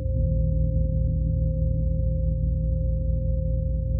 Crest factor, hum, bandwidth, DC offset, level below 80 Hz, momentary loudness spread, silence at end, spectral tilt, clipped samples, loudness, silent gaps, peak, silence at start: 10 dB; 60 Hz at -45 dBFS; 0.6 kHz; under 0.1%; -26 dBFS; 2 LU; 0 s; -22.5 dB/octave; under 0.1%; -26 LUFS; none; -12 dBFS; 0 s